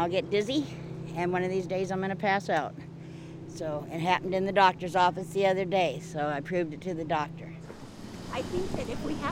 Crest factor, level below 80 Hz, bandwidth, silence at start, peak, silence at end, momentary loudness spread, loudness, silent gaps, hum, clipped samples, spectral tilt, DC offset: 20 dB; -54 dBFS; 16 kHz; 0 s; -10 dBFS; 0 s; 17 LU; -29 LUFS; none; none; under 0.1%; -5.5 dB/octave; under 0.1%